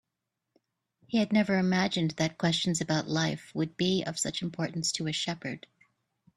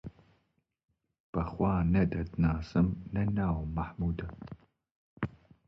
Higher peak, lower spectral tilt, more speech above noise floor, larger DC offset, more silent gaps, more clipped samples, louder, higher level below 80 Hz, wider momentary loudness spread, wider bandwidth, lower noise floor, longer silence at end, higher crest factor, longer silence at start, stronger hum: first, -12 dBFS vs -16 dBFS; second, -4.5 dB/octave vs -10 dB/octave; first, 56 dB vs 46 dB; neither; second, none vs 1.20-1.33 s, 4.91-5.17 s; neither; first, -29 LUFS vs -32 LUFS; second, -66 dBFS vs -44 dBFS; second, 8 LU vs 16 LU; first, 13 kHz vs 6.2 kHz; first, -85 dBFS vs -77 dBFS; first, 0.8 s vs 0.4 s; about the same, 18 dB vs 18 dB; first, 1.1 s vs 0.05 s; neither